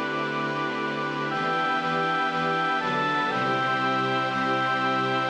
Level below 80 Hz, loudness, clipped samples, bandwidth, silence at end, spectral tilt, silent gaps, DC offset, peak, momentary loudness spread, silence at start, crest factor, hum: -70 dBFS; -25 LUFS; under 0.1%; 10 kHz; 0 s; -5 dB/octave; none; under 0.1%; -14 dBFS; 4 LU; 0 s; 12 dB; none